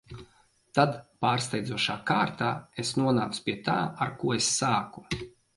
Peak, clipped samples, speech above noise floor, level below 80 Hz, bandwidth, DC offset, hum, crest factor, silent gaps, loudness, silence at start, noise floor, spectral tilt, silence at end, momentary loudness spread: -8 dBFS; under 0.1%; 35 dB; -58 dBFS; 11.5 kHz; under 0.1%; none; 22 dB; none; -28 LUFS; 0.1 s; -63 dBFS; -4 dB/octave; 0.25 s; 10 LU